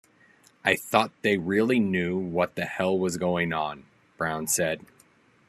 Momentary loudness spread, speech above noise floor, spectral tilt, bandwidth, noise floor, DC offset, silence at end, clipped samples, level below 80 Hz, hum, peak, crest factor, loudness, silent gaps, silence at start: 7 LU; 34 dB; -4.5 dB/octave; 13.5 kHz; -60 dBFS; under 0.1%; 0.7 s; under 0.1%; -64 dBFS; none; -4 dBFS; 22 dB; -26 LUFS; none; 0.65 s